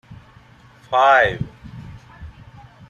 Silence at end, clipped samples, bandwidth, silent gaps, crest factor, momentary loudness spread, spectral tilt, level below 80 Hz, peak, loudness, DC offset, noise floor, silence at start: 0.6 s; under 0.1%; 9.4 kHz; none; 18 dB; 27 LU; -5 dB/octave; -46 dBFS; -4 dBFS; -16 LUFS; under 0.1%; -48 dBFS; 0.1 s